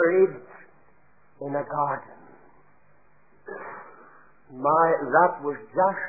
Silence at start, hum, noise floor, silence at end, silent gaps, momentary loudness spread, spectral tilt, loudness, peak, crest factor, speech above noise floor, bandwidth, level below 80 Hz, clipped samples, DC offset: 0 s; none; -62 dBFS; 0 s; none; 21 LU; -13 dB/octave; -24 LUFS; -6 dBFS; 20 dB; 38 dB; 2.6 kHz; -74 dBFS; under 0.1%; 0.2%